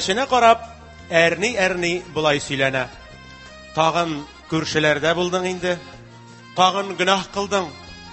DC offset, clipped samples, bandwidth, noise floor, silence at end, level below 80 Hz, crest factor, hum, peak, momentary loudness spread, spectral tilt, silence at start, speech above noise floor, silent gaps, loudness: under 0.1%; under 0.1%; 8.6 kHz; -43 dBFS; 0 s; -50 dBFS; 22 dB; none; 0 dBFS; 15 LU; -4 dB/octave; 0 s; 23 dB; none; -20 LUFS